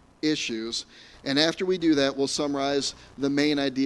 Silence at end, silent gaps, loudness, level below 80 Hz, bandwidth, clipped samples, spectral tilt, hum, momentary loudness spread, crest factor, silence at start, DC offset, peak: 0 s; none; -25 LUFS; -60 dBFS; 11.5 kHz; under 0.1%; -3.5 dB/octave; none; 9 LU; 22 dB; 0.25 s; under 0.1%; -4 dBFS